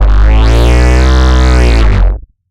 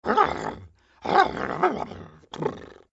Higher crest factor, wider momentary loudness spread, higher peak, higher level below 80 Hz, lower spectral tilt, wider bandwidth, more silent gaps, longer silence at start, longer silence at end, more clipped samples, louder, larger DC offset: second, 6 dB vs 24 dB; second, 5 LU vs 21 LU; about the same, 0 dBFS vs -2 dBFS; first, -6 dBFS vs -54 dBFS; about the same, -6 dB/octave vs -5.5 dB/octave; first, 9.6 kHz vs 8 kHz; neither; about the same, 0 s vs 0.05 s; second, 0 s vs 0.2 s; neither; first, -9 LUFS vs -25 LUFS; neither